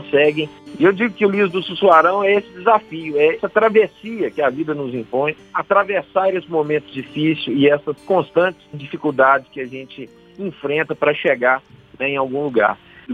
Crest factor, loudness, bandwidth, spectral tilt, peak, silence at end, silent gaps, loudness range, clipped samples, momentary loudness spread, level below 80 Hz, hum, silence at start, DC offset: 18 dB; -18 LUFS; 6.6 kHz; -7 dB/octave; 0 dBFS; 0 s; none; 4 LU; under 0.1%; 14 LU; -62 dBFS; none; 0 s; under 0.1%